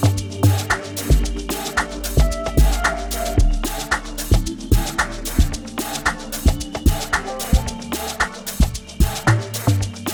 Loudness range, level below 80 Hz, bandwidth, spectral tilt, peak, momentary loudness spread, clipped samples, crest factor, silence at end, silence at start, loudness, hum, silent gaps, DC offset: 2 LU; -22 dBFS; over 20 kHz; -4.5 dB/octave; -2 dBFS; 4 LU; under 0.1%; 16 dB; 0 s; 0 s; -21 LUFS; none; none; under 0.1%